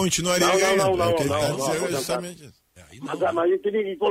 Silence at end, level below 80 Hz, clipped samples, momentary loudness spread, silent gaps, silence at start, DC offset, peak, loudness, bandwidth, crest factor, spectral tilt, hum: 0 s; -52 dBFS; under 0.1%; 10 LU; none; 0 s; under 0.1%; -8 dBFS; -22 LUFS; 16 kHz; 14 dB; -3.5 dB/octave; none